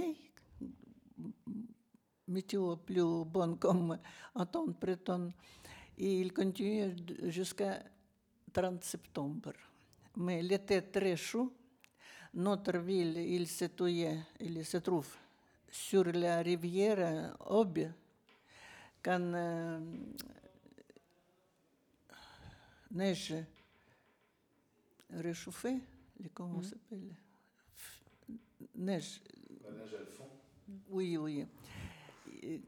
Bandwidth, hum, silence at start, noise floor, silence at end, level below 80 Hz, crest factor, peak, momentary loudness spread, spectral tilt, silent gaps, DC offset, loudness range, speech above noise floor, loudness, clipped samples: 20 kHz; none; 0 s; -75 dBFS; 0 s; -72 dBFS; 20 dB; -18 dBFS; 21 LU; -6 dB/octave; none; under 0.1%; 11 LU; 38 dB; -38 LUFS; under 0.1%